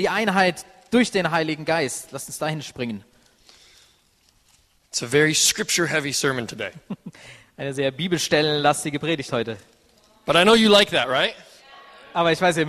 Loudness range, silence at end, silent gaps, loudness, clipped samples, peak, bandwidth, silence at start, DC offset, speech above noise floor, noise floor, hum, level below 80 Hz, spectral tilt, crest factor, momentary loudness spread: 8 LU; 0 s; none; -21 LUFS; under 0.1%; -2 dBFS; 13.5 kHz; 0 s; under 0.1%; 40 dB; -61 dBFS; none; -58 dBFS; -3 dB/octave; 20 dB; 17 LU